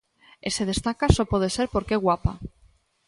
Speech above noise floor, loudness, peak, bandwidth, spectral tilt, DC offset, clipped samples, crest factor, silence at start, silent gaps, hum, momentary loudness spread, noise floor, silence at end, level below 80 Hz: 36 dB; -25 LUFS; -4 dBFS; 11.5 kHz; -5.5 dB/octave; under 0.1%; under 0.1%; 22 dB; 0.45 s; none; none; 12 LU; -60 dBFS; 0.6 s; -36 dBFS